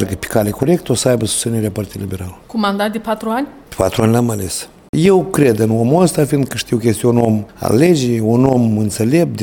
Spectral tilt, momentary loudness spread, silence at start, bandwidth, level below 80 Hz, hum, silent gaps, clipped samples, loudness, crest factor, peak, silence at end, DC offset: -6 dB/octave; 10 LU; 0 s; 18.5 kHz; -42 dBFS; none; 4.89-4.93 s; under 0.1%; -15 LUFS; 14 dB; 0 dBFS; 0 s; under 0.1%